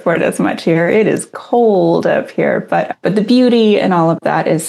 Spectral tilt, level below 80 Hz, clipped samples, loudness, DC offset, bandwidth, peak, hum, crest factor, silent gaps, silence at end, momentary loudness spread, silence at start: -6 dB/octave; -68 dBFS; under 0.1%; -13 LUFS; under 0.1%; 12.5 kHz; 0 dBFS; none; 12 dB; none; 0 s; 6 LU; 0 s